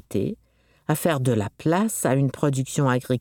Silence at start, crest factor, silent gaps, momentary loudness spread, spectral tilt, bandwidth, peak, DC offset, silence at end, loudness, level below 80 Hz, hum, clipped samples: 0.1 s; 16 dB; none; 7 LU; -6 dB/octave; 18.5 kHz; -8 dBFS; under 0.1%; 0 s; -23 LUFS; -58 dBFS; none; under 0.1%